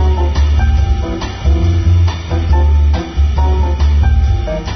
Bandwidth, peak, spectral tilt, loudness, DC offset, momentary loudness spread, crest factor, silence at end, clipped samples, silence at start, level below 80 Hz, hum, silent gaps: 6.4 kHz; -2 dBFS; -7 dB/octave; -14 LUFS; under 0.1%; 5 LU; 8 dB; 0 s; under 0.1%; 0 s; -12 dBFS; none; none